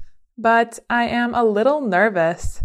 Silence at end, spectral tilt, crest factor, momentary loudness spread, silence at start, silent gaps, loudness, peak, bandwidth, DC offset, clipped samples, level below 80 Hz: 0 s; -5.5 dB/octave; 14 dB; 4 LU; 0 s; none; -18 LUFS; -4 dBFS; 13 kHz; under 0.1%; under 0.1%; -38 dBFS